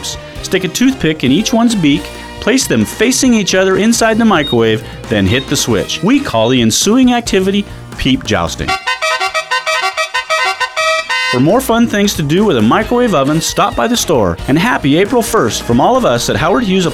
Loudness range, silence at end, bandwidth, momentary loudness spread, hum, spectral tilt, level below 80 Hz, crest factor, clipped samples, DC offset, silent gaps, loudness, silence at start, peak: 2 LU; 0 s; 16.5 kHz; 5 LU; none; -4 dB/octave; -34 dBFS; 10 dB; under 0.1%; under 0.1%; none; -12 LUFS; 0 s; -2 dBFS